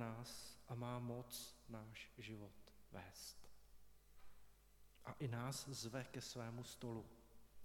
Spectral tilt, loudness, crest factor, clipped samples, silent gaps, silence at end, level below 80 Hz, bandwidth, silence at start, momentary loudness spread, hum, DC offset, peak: -4.5 dB/octave; -52 LUFS; 20 dB; under 0.1%; none; 0 s; -72 dBFS; 18 kHz; 0 s; 13 LU; none; under 0.1%; -34 dBFS